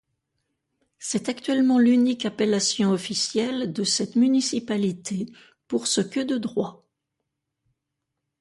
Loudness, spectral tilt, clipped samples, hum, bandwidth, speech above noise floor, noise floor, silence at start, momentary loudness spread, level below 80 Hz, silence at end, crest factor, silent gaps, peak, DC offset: -23 LUFS; -4 dB/octave; under 0.1%; none; 11.5 kHz; 59 dB; -82 dBFS; 1 s; 11 LU; -68 dBFS; 1.65 s; 16 dB; none; -10 dBFS; under 0.1%